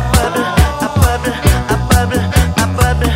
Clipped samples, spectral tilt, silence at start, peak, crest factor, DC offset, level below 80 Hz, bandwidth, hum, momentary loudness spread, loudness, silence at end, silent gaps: under 0.1%; -5 dB/octave; 0 s; 0 dBFS; 12 dB; under 0.1%; -18 dBFS; 16.5 kHz; none; 2 LU; -13 LUFS; 0 s; none